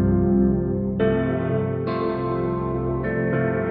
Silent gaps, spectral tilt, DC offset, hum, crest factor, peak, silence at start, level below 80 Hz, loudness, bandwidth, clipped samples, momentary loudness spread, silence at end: none; -12.5 dB/octave; under 0.1%; none; 12 dB; -8 dBFS; 0 s; -36 dBFS; -23 LUFS; 4.7 kHz; under 0.1%; 6 LU; 0 s